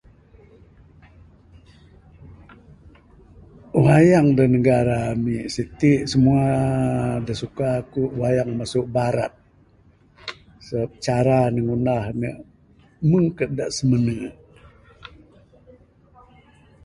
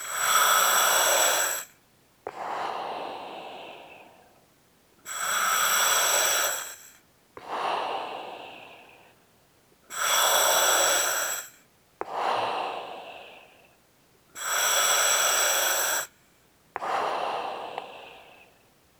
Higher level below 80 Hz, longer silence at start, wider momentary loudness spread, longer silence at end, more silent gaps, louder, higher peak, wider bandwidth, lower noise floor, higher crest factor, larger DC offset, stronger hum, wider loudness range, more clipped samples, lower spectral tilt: first, -46 dBFS vs -74 dBFS; first, 2.25 s vs 0 s; second, 13 LU vs 22 LU; first, 1.8 s vs 0.75 s; neither; first, -20 LUFS vs -23 LUFS; first, -4 dBFS vs -8 dBFS; second, 11.5 kHz vs over 20 kHz; second, -55 dBFS vs -62 dBFS; about the same, 20 dB vs 20 dB; neither; neither; second, 7 LU vs 10 LU; neither; first, -7.5 dB/octave vs 1.5 dB/octave